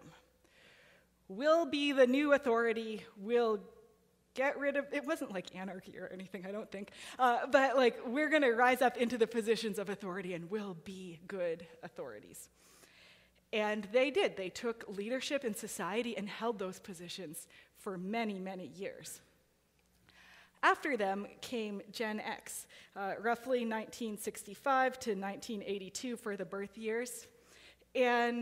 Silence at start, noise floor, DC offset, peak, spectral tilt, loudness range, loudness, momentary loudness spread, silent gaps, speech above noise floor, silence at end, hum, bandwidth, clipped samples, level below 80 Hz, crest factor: 0 s; -73 dBFS; under 0.1%; -14 dBFS; -4 dB/octave; 10 LU; -35 LUFS; 17 LU; none; 38 dB; 0 s; none; 16 kHz; under 0.1%; -76 dBFS; 22 dB